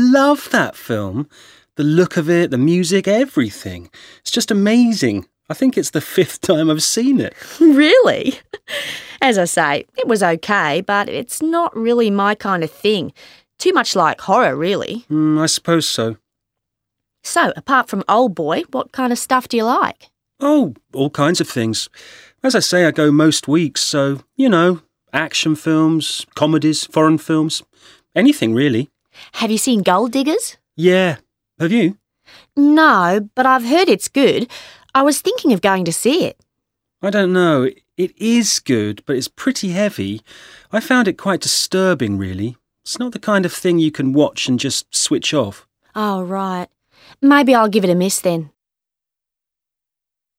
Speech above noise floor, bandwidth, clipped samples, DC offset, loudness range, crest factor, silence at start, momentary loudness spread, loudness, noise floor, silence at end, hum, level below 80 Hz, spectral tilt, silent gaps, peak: 70 dB; 16.5 kHz; under 0.1%; under 0.1%; 4 LU; 16 dB; 0 s; 11 LU; -16 LUFS; -86 dBFS; 1.9 s; none; -62 dBFS; -4.5 dB/octave; none; 0 dBFS